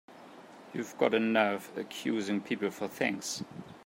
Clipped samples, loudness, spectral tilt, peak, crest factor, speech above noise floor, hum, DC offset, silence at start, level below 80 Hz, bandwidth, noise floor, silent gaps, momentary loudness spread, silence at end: under 0.1%; -32 LUFS; -4 dB/octave; -12 dBFS; 22 dB; 20 dB; none; under 0.1%; 0.1 s; -78 dBFS; 16 kHz; -52 dBFS; none; 21 LU; 0 s